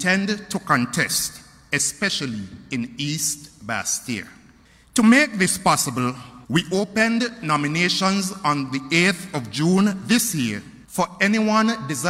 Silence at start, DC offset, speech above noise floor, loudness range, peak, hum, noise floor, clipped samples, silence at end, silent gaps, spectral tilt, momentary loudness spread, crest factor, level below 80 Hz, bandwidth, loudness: 0 s; under 0.1%; 31 dB; 4 LU; -2 dBFS; none; -52 dBFS; under 0.1%; 0 s; none; -3.5 dB/octave; 11 LU; 18 dB; -56 dBFS; 16 kHz; -21 LUFS